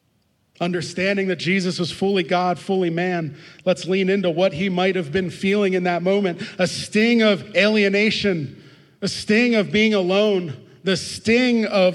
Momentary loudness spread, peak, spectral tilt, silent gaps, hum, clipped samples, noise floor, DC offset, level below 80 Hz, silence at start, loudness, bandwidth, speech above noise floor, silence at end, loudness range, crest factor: 8 LU; -4 dBFS; -5.5 dB/octave; none; none; under 0.1%; -65 dBFS; under 0.1%; -60 dBFS; 0.6 s; -20 LUFS; 12 kHz; 45 dB; 0 s; 3 LU; 18 dB